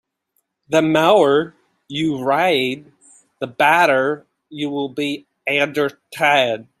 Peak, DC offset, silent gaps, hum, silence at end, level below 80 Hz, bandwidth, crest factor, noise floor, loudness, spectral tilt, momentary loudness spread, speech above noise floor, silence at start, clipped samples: -2 dBFS; under 0.1%; none; none; 0.2 s; -66 dBFS; 15 kHz; 18 dB; -70 dBFS; -18 LUFS; -4.5 dB/octave; 16 LU; 53 dB; 0.7 s; under 0.1%